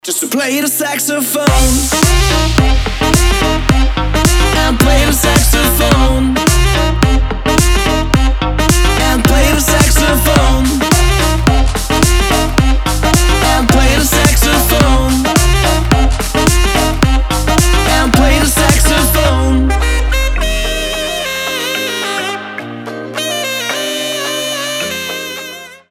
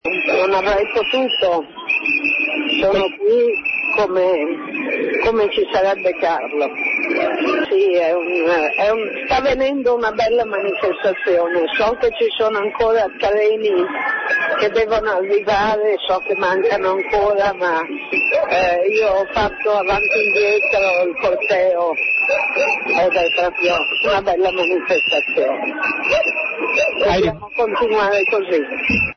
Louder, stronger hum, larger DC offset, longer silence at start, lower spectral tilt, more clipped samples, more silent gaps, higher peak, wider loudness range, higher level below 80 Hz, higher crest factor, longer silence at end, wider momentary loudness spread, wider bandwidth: first, -12 LUFS vs -17 LUFS; neither; neither; about the same, 0.05 s vs 0.05 s; about the same, -4 dB/octave vs -4.5 dB/octave; neither; neither; first, 0 dBFS vs -6 dBFS; first, 6 LU vs 2 LU; first, -14 dBFS vs -46 dBFS; about the same, 10 dB vs 12 dB; about the same, 0.15 s vs 0.05 s; first, 7 LU vs 4 LU; first, 17 kHz vs 6.6 kHz